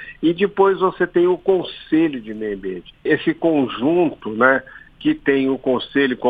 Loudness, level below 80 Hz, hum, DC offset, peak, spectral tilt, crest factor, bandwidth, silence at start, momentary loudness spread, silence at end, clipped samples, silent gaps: -19 LUFS; -52 dBFS; none; under 0.1%; 0 dBFS; -8.5 dB/octave; 18 dB; 4.8 kHz; 0 s; 10 LU; 0 s; under 0.1%; none